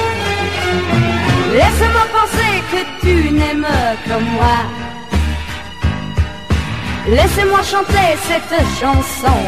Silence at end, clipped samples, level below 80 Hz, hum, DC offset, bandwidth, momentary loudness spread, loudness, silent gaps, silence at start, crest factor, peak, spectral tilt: 0 s; under 0.1%; -22 dBFS; none; 2%; 15.5 kHz; 8 LU; -15 LUFS; none; 0 s; 12 dB; -2 dBFS; -5 dB/octave